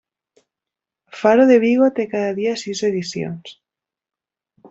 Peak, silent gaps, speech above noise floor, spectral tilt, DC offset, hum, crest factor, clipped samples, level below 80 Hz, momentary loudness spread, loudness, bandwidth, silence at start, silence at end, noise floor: -2 dBFS; none; 72 dB; -5.5 dB/octave; under 0.1%; none; 18 dB; under 0.1%; -64 dBFS; 15 LU; -17 LUFS; 8 kHz; 1.15 s; 0.05 s; -88 dBFS